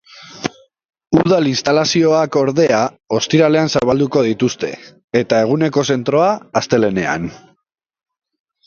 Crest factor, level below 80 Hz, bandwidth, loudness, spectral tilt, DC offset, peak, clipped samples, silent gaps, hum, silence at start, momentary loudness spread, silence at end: 16 dB; -52 dBFS; 7.4 kHz; -15 LUFS; -5.5 dB/octave; under 0.1%; 0 dBFS; under 0.1%; 0.85-0.89 s, 5.04-5.08 s; none; 0.15 s; 11 LU; 1.3 s